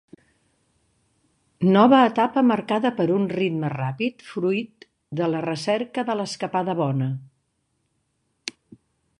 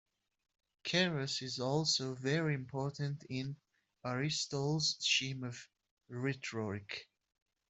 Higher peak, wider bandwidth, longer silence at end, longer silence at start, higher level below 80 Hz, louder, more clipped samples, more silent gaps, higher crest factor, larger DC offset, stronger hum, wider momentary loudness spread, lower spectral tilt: first, -2 dBFS vs -18 dBFS; first, 11 kHz vs 8.2 kHz; about the same, 0.7 s vs 0.65 s; first, 1.6 s vs 0.85 s; first, -68 dBFS vs -74 dBFS; first, -22 LUFS vs -36 LUFS; neither; second, none vs 5.91-5.97 s; about the same, 20 dB vs 20 dB; neither; neither; first, 17 LU vs 14 LU; first, -6.5 dB/octave vs -4 dB/octave